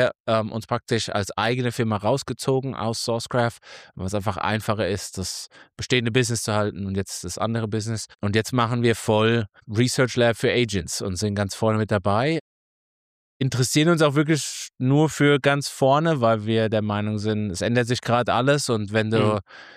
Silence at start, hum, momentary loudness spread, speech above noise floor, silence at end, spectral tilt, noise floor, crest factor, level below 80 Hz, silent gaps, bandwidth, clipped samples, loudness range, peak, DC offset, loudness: 0 s; none; 9 LU; over 68 dB; 0.05 s; -5 dB/octave; under -90 dBFS; 16 dB; -54 dBFS; 0.20-0.24 s, 12.41-13.40 s; 15.5 kHz; under 0.1%; 5 LU; -6 dBFS; under 0.1%; -23 LUFS